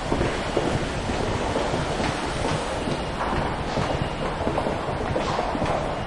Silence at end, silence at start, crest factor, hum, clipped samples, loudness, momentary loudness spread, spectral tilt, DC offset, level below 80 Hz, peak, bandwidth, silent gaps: 0 s; 0 s; 18 dB; none; under 0.1%; -26 LUFS; 2 LU; -5.5 dB/octave; under 0.1%; -36 dBFS; -8 dBFS; 11.5 kHz; none